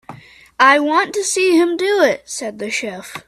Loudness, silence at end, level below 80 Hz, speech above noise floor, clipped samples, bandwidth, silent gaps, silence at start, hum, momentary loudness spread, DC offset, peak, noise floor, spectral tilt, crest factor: -15 LUFS; 0.05 s; -62 dBFS; 23 dB; under 0.1%; 14 kHz; none; 0.1 s; none; 12 LU; under 0.1%; 0 dBFS; -39 dBFS; -2 dB/octave; 16 dB